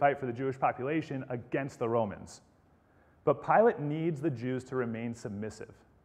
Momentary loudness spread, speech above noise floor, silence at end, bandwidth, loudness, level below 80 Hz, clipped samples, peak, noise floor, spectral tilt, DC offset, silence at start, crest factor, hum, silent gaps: 14 LU; 33 dB; 0.3 s; 10.5 kHz; -32 LUFS; -68 dBFS; under 0.1%; -12 dBFS; -64 dBFS; -7.5 dB/octave; under 0.1%; 0 s; 20 dB; none; none